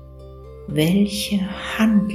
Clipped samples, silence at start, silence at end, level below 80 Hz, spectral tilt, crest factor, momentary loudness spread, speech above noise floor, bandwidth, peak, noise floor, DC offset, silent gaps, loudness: under 0.1%; 0 s; 0 s; -42 dBFS; -5.5 dB/octave; 16 dB; 22 LU; 20 dB; 14.5 kHz; -4 dBFS; -39 dBFS; under 0.1%; none; -20 LUFS